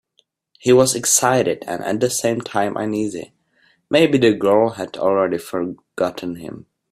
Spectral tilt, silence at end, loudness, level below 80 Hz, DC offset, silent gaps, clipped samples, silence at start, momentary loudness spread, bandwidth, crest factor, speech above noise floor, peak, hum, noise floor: -4 dB/octave; 0.35 s; -18 LUFS; -58 dBFS; under 0.1%; none; under 0.1%; 0.65 s; 13 LU; 15.5 kHz; 18 dB; 46 dB; 0 dBFS; none; -64 dBFS